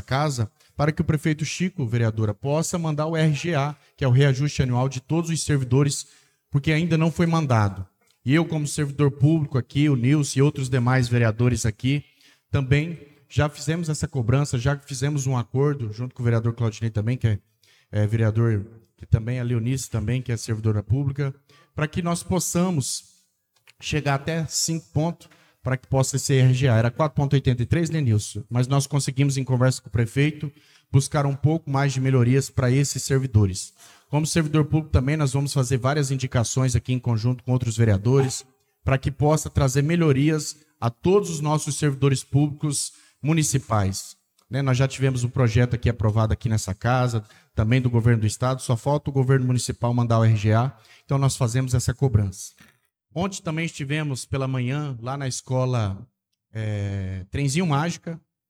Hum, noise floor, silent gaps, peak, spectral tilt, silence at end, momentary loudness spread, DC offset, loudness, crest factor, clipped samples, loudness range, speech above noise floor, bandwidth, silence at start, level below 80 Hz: none; -66 dBFS; none; -6 dBFS; -6 dB/octave; 0.3 s; 9 LU; under 0.1%; -23 LUFS; 18 dB; under 0.1%; 4 LU; 44 dB; 14.5 kHz; 0.1 s; -48 dBFS